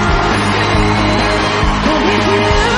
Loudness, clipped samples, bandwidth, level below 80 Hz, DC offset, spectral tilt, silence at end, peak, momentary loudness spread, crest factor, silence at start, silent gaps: -12 LUFS; under 0.1%; 11 kHz; -22 dBFS; under 0.1%; -5 dB/octave; 0 s; 0 dBFS; 1 LU; 12 dB; 0 s; none